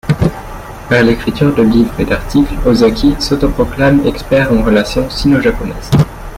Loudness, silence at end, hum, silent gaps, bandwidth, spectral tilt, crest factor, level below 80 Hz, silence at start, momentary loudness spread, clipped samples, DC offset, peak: -12 LUFS; 0 s; none; none; 16 kHz; -6.5 dB/octave; 12 dB; -24 dBFS; 0.05 s; 6 LU; under 0.1%; under 0.1%; 0 dBFS